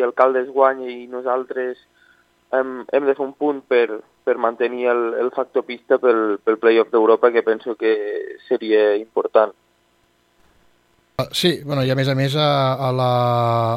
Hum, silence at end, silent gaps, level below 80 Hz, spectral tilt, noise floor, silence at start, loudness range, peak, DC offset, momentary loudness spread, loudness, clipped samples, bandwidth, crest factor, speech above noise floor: 60 Hz at -60 dBFS; 0 s; none; -62 dBFS; -6.5 dB/octave; -61 dBFS; 0 s; 5 LU; 0 dBFS; under 0.1%; 10 LU; -19 LUFS; under 0.1%; 15.5 kHz; 18 dB; 43 dB